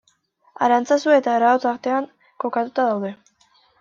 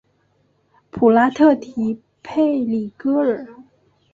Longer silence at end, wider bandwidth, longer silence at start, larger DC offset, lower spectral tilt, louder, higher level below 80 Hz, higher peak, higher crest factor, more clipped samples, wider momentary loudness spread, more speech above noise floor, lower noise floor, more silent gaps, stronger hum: first, 0.65 s vs 0.5 s; about the same, 7.6 kHz vs 7.4 kHz; second, 0.6 s vs 0.95 s; neither; second, -5 dB/octave vs -7.5 dB/octave; about the same, -20 LUFS vs -18 LUFS; second, -74 dBFS vs -60 dBFS; about the same, -4 dBFS vs -2 dBFS; about the same, 16 dB vs 18 dB; neither; second, 11 LU vs 15 LU; about the same, 43 dB vs 45 dB; about the same, -61 dBFS vs -62 dBFS; neither; neither